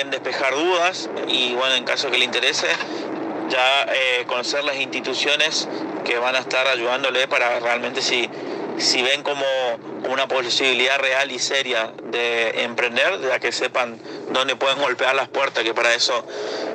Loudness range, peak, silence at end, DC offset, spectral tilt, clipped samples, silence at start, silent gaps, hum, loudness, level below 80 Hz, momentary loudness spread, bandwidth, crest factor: 1 LU; -4 dBFS; 0 s; under 0.1%; -1.5 dB/octave; under 0.1%; 0 s; none; none; -20 LUFS; -76 dBFS; 8 LU; 14.5 kHz; 18 dB